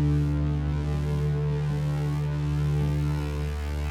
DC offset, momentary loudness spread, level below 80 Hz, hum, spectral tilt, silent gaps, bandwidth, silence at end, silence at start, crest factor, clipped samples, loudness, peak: under 0.1%; 4 LU; -32 dBFS; none; -8 dB/octave; none; 9.8 kHz; 0 s; 0 s; 10 dB; under 0.1%; -27 LUFS; -16 dBFS